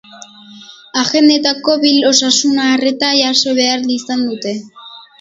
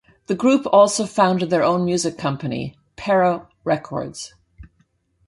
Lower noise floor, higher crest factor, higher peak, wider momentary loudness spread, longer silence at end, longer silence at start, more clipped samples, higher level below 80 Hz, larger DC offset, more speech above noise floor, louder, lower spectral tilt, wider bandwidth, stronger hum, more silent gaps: second, -37 dBFS vs -64 dBFS; about the same, 14 dB vs 18 dB; about the same, 0 dBFS vs -2 dBFS; second, 11 LU vs 16 LU; second, 0.2 s vs 0.6 s; second, 0.15 s vs 0.3 s; neither; second, -62 dBFS vs -54 dBFS; neither; second, 24 dB vs 45 dB; first, -12 LUFS vs -19 LUFS; second, -1.5 dB/octave vs -5 dB/octave; second, 7.8 kHz vs 11.5 kHz; neither; neither